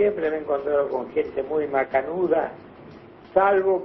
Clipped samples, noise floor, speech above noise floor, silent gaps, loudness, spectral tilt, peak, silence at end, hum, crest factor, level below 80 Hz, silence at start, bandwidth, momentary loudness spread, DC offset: under 0.1%; -45 dBFS; 22 dB; none; -24 LUFS; -9 dB/octave; -4 dBFS; 0 s; none; 18 dB; -58 dBFS; 0 s; 5.6 kHz; 7 LU; under 0.1%